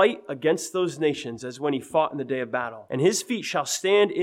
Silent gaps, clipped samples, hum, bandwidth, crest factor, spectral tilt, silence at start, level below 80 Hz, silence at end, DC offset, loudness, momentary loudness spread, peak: none; under 0.1%; none; 16 kHz; 16 dB; -4 dB/octave; 0 s; -72 dBFS; 0 s; under 0.1%; -25 LUFS; 8 LU; -8 dBFS